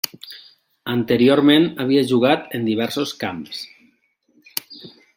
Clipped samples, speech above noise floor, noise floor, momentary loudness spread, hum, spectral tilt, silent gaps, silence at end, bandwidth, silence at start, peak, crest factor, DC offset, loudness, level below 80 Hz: under 0.1%; 44 dB; -63 dBFS; 23 LU; none; -5.5 dB/octave; none; 0.3 s; 16.5 kHz; 0.05 s; -2 dBFS; 18 dB; under 0.1%; -19 LUFS; -62 dBFS